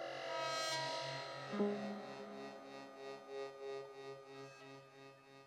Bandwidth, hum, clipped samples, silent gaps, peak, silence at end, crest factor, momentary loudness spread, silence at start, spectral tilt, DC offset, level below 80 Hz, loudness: 15 kHz; none; under 0.1%; none; -26 dBFS; 0 s; 20 dB; 17 LU; 0 s; -3.5 dB/octave; under 0.1%; -88 dBFS; -45 LUFS